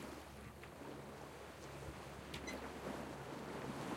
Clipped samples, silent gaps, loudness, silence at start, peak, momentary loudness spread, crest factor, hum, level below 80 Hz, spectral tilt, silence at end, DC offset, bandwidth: under 0.1%; none; -50 LUFS; 0 s; -32 dBFS; 6 LU; 18 dB; none; -64 dBFS; -5 dB/octave; 0 s; under 0.1%; 16.5 kHz